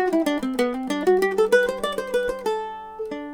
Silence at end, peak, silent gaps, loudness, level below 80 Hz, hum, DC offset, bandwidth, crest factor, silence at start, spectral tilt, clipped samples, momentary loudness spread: 0 s; -6 dBFS; none; -23 LUFS; -52 dBFS; none; under 0.1%; over 20 kHz; 16 dB; 0 s; -4 dB/octave; under 0.1%; 13 LU